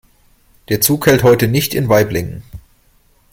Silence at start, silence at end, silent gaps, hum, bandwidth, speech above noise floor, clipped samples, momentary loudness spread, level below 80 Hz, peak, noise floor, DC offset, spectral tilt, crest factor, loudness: 0.7 s; 0.75 s; none; none; 16.5 kHz; 40 dB; under 0.1%; 12 LU; -42 dBFS; 0 dBFS; -53 dBFS; under 0.1%; -5 dB/octave; 16 dB; -13 LUFS